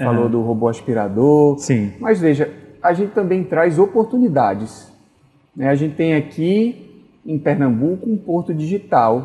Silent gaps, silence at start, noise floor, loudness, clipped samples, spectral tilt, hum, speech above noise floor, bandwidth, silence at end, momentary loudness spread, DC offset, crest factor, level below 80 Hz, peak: none; 0 s; -55 dBFS; -17 LUFS; under 0.1%; -8 dB/octave; none; 38 dB; 11.5 kHz; 0 s; 8 LU; under 0.1%; 16 dB; -58 dBFS; -2 dBFS